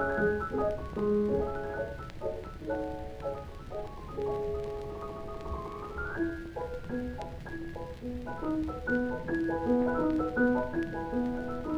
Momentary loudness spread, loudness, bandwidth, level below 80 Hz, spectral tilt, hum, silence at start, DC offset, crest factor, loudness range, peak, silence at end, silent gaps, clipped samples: 12 LU; -34 LUFS; 13.5 kHz; -46 dBFS; -8 dB/octave; none; 0 s; under 0.1%; 18 dB; 7 LU; -16 dBFS; 0 s; none; under 0.1%